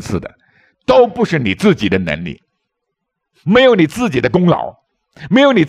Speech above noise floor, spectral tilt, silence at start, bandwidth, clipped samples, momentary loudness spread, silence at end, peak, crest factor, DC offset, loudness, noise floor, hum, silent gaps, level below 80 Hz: 62 dB; -6.5 dB/octave; 0 s; 13 kHz; under 0.1%; 14 LU; 0 s; 0 dBFS; 14 dB; under 0.1%; -13 LUFS; -75 dBFS; none; none; -46 dBFS